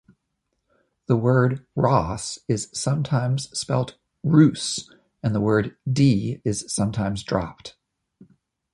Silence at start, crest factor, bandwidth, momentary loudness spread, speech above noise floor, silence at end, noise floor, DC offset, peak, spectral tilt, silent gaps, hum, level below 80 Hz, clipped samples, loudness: 1.1 s; 20 dB; 11.5 kHz; 11 LU; 55 dB; 1.05 s; -76 dBFS; under 0.1%; -4 dBFS; -6 dB/octave; none; none; -50 dBFS; under 0.1%; -23 LUFS